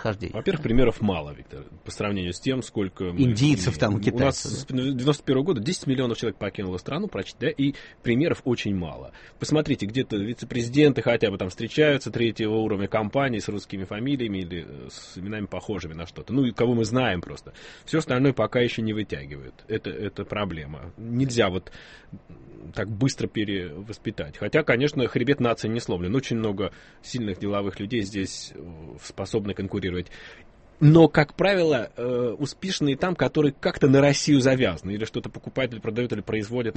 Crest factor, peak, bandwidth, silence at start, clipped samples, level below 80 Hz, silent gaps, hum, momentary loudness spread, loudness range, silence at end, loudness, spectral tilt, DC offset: 22 dB; -4 dBFS; 8.8 kHz; 0 s; under 0.1%; -46 dBFS; none; none; 16 LU; 7 LU; 0.05 s; -25 LUFS; -6 dB/octave; under 0.1%